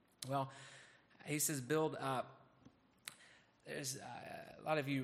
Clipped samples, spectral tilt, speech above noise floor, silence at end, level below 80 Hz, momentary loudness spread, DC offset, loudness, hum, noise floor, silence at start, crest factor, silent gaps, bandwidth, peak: under 0.1%; -4 dB/octave; 27 dB; 0 s; -82 dBFS; 19 LU; under 0.1%; -42 LUFS; none; -68 dBFS; 0.2 s; 22 dB; none; 15 kHz; -22 dBFS